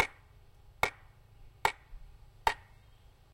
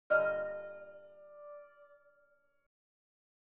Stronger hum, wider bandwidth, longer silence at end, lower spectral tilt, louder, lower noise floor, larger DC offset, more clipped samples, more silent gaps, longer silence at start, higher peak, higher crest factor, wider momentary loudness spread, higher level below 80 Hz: neither; first, 16 kHz vs 4 kHz; second, 0.75 s vs 1.75 s; about the same, -2.5 dB/octave vs -3 dB/octave; about the same, -35 LUFS vs -35 LUFS; second, -59 dBFS vs -72 dBFS; neither; neither; neither; about the same, 0 s vs 0.1 s; first, -10 dBFS vs -18 dBFS; about the same, 28 dB vs 24 dB; second, 19 LU vs 25 LU; first, -54 dBFS vs -84 dBFS